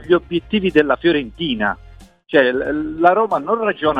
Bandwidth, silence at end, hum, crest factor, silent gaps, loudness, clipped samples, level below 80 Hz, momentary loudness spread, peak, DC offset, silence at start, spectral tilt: 6 kHz; 0 s; none; 18 dB; none; -17 LUFS; under 0.1%; -44 dBFS; 7 LU; 0 dBFS; under 0.1%; 0 s; -7 dB/octave